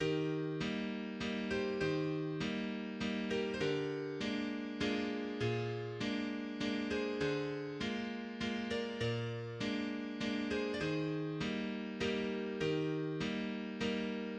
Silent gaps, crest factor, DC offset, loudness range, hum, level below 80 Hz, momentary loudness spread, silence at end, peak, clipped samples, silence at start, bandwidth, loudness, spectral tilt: none; 16 dB; under 0.1%; 1 LU; none; -64 dBFS; 4 LU; 0 s; -22 dBFS; under 0.1%; 0 s; 9.4 kHz; -38 LUFS; -6 dB/octave